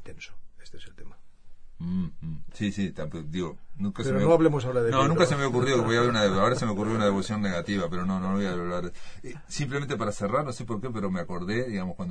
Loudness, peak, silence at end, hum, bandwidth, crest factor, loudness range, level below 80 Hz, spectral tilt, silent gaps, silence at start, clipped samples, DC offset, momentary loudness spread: -27 LUFS; -6 dBFS; 0 s; none; 10 kHz; 22 dB; 11 LU; -48 dBFS; -6 dB/octave; none; 0 s; under 0.1%; under 0.1%; 14 LU